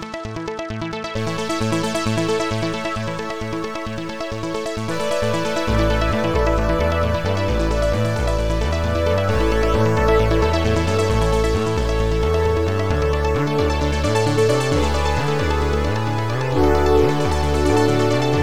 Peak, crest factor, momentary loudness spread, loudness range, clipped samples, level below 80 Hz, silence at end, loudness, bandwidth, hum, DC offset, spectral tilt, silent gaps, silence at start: -4 dBFS; 14 dB; 9 LU; 5 LU; under 0.1%; -28 dBFS; 0 s; -20 LUFS; 17.5 kHz; none; 2%; -6 dB/octave; none; 0 s